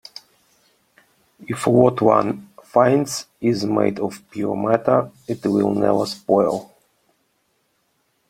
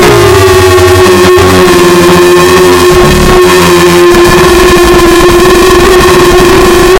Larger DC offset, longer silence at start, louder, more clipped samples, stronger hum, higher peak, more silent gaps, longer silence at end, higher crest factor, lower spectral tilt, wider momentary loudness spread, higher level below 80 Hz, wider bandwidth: neither; first, 1.4 s vs 0 s; second, -20 LUFS vs -2 LUFS; second, under 0.1% vs 5%; neither; about the same, 0 dBFS vs 0 dBFS; neither; first, 1.65 s vs 0 s; first, 20 dB vs 2 dB; first, -6.5 dB/octave vs -4.5 dB/octave; first, 13 LU vs 0 LU; second, -60 dBFS vs -16 dBFS; about the same, 16.5 kHz vs 17.5 kHz